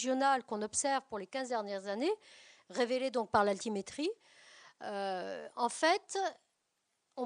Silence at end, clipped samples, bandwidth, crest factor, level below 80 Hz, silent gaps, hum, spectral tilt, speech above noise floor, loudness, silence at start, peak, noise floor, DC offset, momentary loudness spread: 0 s; under 0.1%; 10 kHz; 20 dB; -74 dBFS; none; none; -3 dB/octave; 47 dB; -35 LUFS; 0 s; -14 dBFS; -82 dBFS; under 0.1%; 11 LU